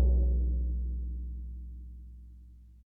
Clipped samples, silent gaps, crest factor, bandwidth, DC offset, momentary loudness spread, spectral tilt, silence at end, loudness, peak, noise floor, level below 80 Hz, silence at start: under 0.1%; none; 14 dB; 0.9 kHz; under 0.1%; 23 LU; -13.5 dB/octave; 0.15 s; -34 LUFS; -16 dBFS; -52 dBFS; -32 dBFS; 0 s